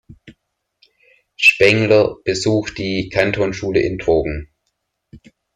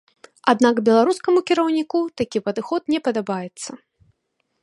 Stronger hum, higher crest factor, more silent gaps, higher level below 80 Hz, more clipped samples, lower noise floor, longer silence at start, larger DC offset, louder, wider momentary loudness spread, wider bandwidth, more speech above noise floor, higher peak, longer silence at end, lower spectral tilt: neither; about the same, 18 dB vs 20 dB; neither; first, -42 dBFS vs -64 dBFS; neither; about the same, -73 dBFS vs -73 dBFS; second, 0.1 s vs 0.45 s; neither; first, -16 LUFS vs -20 LUFS; about the same, 10 LU vs 11 LU; first, 14 kHz vs 11.5 kHz; about the same, 56 dB vs 53 dB; about the same, 0 dBFS vs 0 dBFS; second, 0.4 s vs 0.85 s; about the same, -5 dB/octave vs -5 dB/octave